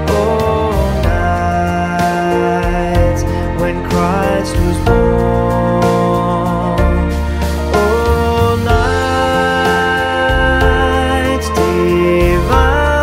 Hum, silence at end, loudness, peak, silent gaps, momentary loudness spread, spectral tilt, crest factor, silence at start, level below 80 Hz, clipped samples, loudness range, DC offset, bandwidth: none; 0 s; -13 LUFS; 0 dBFS; none; 4 LU; -6 dB/octave; 12 dB; 0 s; -20 dBFS; under 0.1%; 2 LU; under 0.1%; 16 kHz